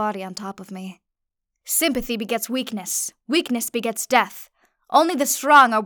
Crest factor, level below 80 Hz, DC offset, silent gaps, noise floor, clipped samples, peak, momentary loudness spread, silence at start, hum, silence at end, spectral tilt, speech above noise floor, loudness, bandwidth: 18 dB; -54 dBFS; under 0.1%; none; -81 dBFS; under 0.1%; -2 dBFS; 18 LU; 0 s; none; 0 s; -2 dB/octave; 60 dB; -20 LUFS; over 20 kHz